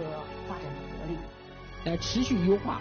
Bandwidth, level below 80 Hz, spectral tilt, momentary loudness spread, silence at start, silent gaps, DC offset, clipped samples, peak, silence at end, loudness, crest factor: 6.6 kHz; -46 dBFS; -5.5 dB/octave; 17 LU; 0 s; none; under 0.1%; under 0.1%; -14 dBFS; 0 s; -31 LUFS; 18 dB